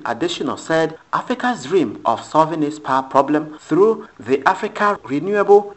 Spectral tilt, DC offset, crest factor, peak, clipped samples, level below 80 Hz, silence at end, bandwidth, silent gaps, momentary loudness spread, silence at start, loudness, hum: -5.5 dB/octave; under 0.1%; 18 dB; 0 dBFS; under 0.1%; -62 dBFS; 0.05 s; 8.4 kHz; none; 7 LU; 0 s; -18 LUFS; none